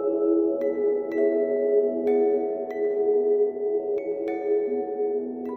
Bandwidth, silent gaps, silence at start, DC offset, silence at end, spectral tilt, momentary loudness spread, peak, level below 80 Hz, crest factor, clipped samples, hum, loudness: 2.7 kHz; none; 0 s; under 0.1%; 0 s; -8.5 dB/octave; 6 LU; -12 dBFS; -72 dBFS; 12 dB; under 0.1%; none; -25 LUFS